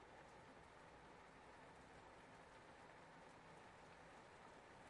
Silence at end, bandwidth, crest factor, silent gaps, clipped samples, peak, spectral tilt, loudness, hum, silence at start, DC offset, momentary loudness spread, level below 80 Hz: 0 s; 11 kHz; 16 dB; none; under 0.1%; -48 dBFS; -4.5 dB/octave; -63 LUFS; none; 0 s; under 0.1%; 1 LU; -80 dBFS